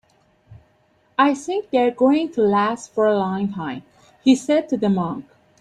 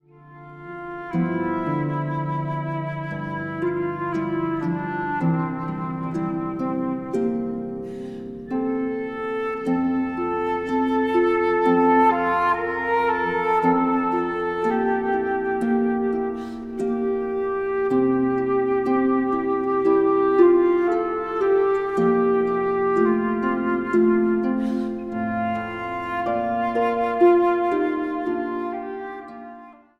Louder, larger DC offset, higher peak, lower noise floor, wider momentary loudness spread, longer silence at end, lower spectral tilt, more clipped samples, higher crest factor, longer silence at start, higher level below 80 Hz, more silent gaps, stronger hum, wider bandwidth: about the same, -20 LUFS vs -22 LUFS; neither; about the same, -4 dBFS vs -4 dBFS; first, -60 dBFS vs -45 dBFS; about the same, 10 LU vs 10 LU; first, 0.4 s vs 0.25 s; second, -6 dB/octave vs -8.5 dB/octave; neither; about the same, 16 dB vs 18 dB; first, 0.5 s vs 0.25 s; second, -62 dBFS vs -56 dBFS; neither; neither; first, 10.5 kHz vs 7.4 kHz